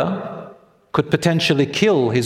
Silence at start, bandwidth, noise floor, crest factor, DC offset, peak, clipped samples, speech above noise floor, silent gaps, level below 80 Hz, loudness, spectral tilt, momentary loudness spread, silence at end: 0 s; 15 kHz; -44 dBFS; 18 dB; under 0.1%; 0 dBFS; under 0.1%; 27 dB; none; -54 dBFS; -18 LUFS; -5.5 dB/octave; 13 LU; 0 s